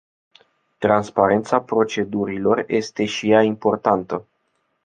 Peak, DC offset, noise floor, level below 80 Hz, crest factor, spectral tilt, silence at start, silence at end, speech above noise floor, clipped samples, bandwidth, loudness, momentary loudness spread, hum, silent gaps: -2 dBFS; under 0.1%; -70 dBFS; -56 dBFS; 18 dB; -5.5 dB/octave; 0.8 s; 0.65 s; 51 dB; under 0.1%; 9.2 kHz; -20 LUFS; 7 LU; none; none